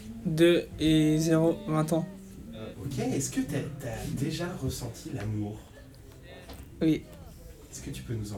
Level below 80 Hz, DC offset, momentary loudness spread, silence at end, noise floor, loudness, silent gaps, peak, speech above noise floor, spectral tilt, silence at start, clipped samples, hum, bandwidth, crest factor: -50 dBFS; under 0.1%; 24 LU; 0 s; -49 dBFS; -29 LUFS; none; -10 dBFS; 21 dB; -6 dB/octave; 0 s; under 0.1%; none; 17 kHz; 20 dB